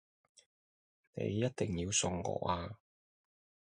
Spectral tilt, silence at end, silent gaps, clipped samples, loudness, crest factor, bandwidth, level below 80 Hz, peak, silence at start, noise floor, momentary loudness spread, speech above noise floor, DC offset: -4 dB/octave; 0.95 s; none; under 0.1%; -36 LUFS; 20 dB; 11.5 kHz; -58 dBFS; -20 dBFS; 1.15 s; under -90 dBFS; 15 LU; over 54 dB; under 0.1%